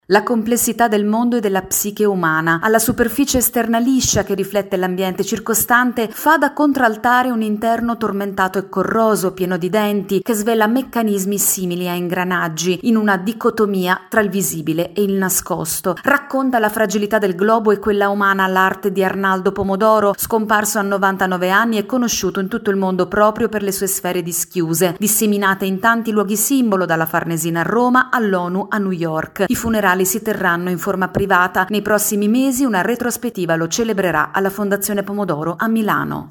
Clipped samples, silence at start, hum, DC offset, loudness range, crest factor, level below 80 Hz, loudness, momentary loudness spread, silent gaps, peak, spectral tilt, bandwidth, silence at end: under 0.1%; 0.1 s; none; under 0.1%; 2 LU; 16 dB; -48 dBFS; -17 LUFS; 5 LU; none; 0 dBFS; -4 dB/octave; 17.5 kHz; 0 s